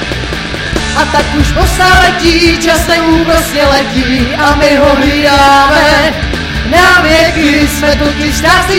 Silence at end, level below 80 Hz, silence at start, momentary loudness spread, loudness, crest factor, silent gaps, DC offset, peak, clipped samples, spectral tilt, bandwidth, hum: 0 s; -18 dBFS; 0 s; 9 LU; -8 LUFS; 8 dB; none; under 0.1%; 0 dBFS; 1%; -4 dB/octave; 17 kHz; none